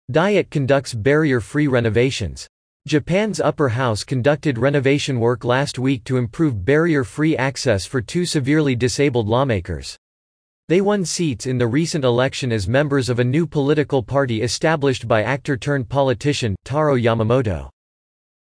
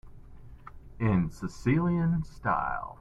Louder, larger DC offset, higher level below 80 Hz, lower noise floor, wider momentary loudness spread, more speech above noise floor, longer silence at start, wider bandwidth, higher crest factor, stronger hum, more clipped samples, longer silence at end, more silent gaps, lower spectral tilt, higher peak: first, -19 LUFS vs -29 LUFS; neither; about the same, -46 dBFS vs -46 dBFS; first, under -90 dBFS vs -47 dBFS; about the same, 5 LU vs 7 LU; first, over 72 dB vs 19 dB; about the same, 0.1 s vs 0.05 s; first, 10.5 kHz vs 8.6 kHz; about the same, 16 dB vs 18 dB; neither; neither; first, 0.7 s vs 0.05 s; first, 2.49-2.80 s, 9.98-10.68 s vs none; second, -6 dB/octave vs -8.5 dB/octave; first, -4 dBFS vs -12 dBFS